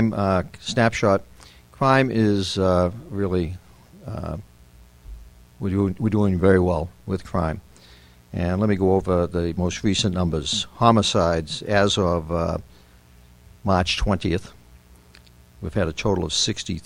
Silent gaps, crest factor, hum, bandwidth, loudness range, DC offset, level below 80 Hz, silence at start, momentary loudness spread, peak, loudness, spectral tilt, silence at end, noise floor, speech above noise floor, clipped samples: none; 22 dB; none; 12.5 kHz; 6 LU; under 0.1%; -40 dBFS; 0 s; 13 LU; 0 dBFS; -22 LUFS; -5.5 dB/octave; 0.05 s; -50 dBFS; 29 dB; under 0.1%